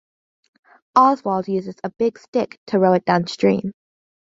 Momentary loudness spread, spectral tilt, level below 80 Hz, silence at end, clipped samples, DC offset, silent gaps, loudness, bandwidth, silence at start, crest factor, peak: 9 LU; -7 dB/octave; -62 dBFS; 0.6 s; under 0.1%; under 0.1%; 2.28-2.33 s, 2.57-2.66 s; -19 LUFS; 7.8 kHz; 0.95 s; 18 dB; -2 dBFS